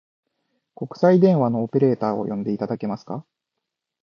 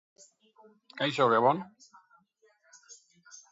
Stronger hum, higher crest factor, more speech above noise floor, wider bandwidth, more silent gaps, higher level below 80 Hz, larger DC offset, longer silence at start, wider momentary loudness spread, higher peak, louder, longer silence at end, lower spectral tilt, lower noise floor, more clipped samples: neither; about the same, 18 dB vs 22 dB; first, 62 dB vs 40 dB; second, 6.6 kHz vs 7.8 kHz; neither; first, -68 dBFS vs -82 dBFS; neither; second, 0.8 s vs 0.95 s; second, 19 LU vs 28 LU; first, -4 dBFS vs -10 dBFS; first, -21 LUFS vs -27 LUFS; first, 0.85 s vs 0.15 s; first, -10 dB/octave vs -5 dB/octave; first, -82 dBFS vs -68 dBFS; neither